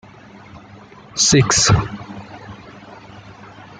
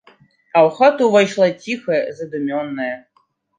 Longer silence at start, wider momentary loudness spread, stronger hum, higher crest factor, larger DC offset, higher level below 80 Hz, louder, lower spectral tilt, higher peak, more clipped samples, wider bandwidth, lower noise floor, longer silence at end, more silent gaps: about the same, 0.55 s vs 0.55 s; first, 27 LU vs 13 LU; neither; about the same, 18 dB vs 16 dB; neither; first, -40 dBFS vs -68 dBFS; about the same, -15 LUFS vs -17 LUFS; second, -3 dB/octave vs -5.5 dB/octave; about the same, -2 dBFS vs -2 dBFS; neither; about the same, 10 kHz vs 9.6 kHz; second, -42 dBFS vs -62 dBFS; second, 0.45 s vs 0.6 s; neither